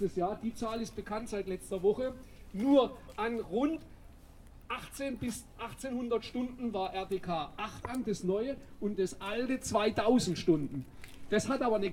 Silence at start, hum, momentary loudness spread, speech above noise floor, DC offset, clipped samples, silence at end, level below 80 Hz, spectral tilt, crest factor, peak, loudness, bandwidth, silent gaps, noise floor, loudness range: 0 s; none; 12 LU; 20 dB; under 0.1%; under 0.1%; 0 s; -54 dBFS; -5.5 dB/octave; 20 dB; -14 dBFS; -34 LUFS; 16.5 kHz; none; -54 dBFS; 5 LU